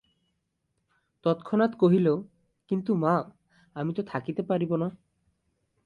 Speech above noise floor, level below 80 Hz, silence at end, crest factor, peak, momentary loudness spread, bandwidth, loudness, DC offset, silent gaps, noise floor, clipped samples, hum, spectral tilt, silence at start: 52 dB; -70 dBFS; 0.95 s; 18 dB; -10 dBFS; 11 LU; 5 kHz; -27 LUFS; under 0.1%; none; -78 dBFS; under 0.1%; none; -9.5 dB/octave; 1.25 s